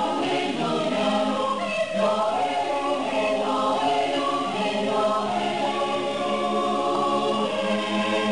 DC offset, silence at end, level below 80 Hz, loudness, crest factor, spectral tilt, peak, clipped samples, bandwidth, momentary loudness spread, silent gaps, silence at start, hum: 0.4%; 0 s; -62 dBFS; -24 LUFS; 12 dB; -4.5 dB/octave; -12 dBFS; under 0.1%; 10.5 kHz; 2 LU; none; 0 s; none